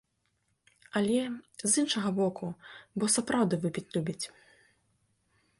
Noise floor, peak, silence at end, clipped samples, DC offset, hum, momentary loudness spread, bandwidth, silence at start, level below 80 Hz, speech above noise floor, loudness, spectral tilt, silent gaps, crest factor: -76 dBFS; -12 dBFS; 1.35 s; under 0.1%; under 0.1%; none; 14 LU; 11.5 kHz; 0.95 s; -70 dBFS; 46 dB; -30 LUFS; -4 dB/octave; none; 20 dB